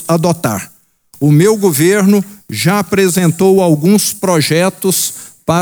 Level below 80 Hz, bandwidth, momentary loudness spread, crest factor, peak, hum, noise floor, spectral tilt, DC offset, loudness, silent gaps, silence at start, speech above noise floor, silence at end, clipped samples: -52 dBFS; over 20 kHz; 9 LU; 12 dB; 0 dBFS; none; -45 dBFS; -5 dB/octave; under 0.1%; -12 LUFS; none; 0 s; 34 dB; 0 s; under 0.1%